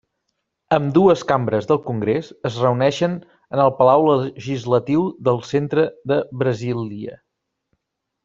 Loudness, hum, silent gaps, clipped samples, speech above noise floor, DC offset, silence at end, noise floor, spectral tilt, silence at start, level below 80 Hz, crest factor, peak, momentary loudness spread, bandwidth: -19 LUFS; none; none; under 0.1%; 59 dB; under 0.1%; 1.1 s; -77 dBFS; -7.5 dB/octave; 0.7 s; -58 dBFS; 18 dB; -2 dBFS; 11 LU; 7.6 kHz